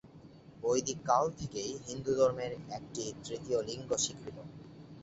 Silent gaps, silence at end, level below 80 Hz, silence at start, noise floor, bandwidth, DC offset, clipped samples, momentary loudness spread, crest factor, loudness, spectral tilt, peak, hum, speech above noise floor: none; 0 s; -64 dBFS; 0.05 s; -55 dBFS; 8.2 kHz; under 0.1%; under 0.1%; 17 LU; 22 dB; -34 LUFS; -4 dB/octave; -14 dBFS; none; 20 dB